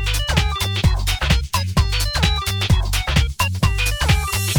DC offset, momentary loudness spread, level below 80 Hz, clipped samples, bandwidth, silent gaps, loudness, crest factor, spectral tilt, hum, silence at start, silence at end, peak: under 0.1%; 2 LU; -22 dBFS; under 0.1%; 19.5 kHz; none; -19 LUFS; 16 dB; -4 dB/octave; none; 0 s; 0 s; -2 dBFS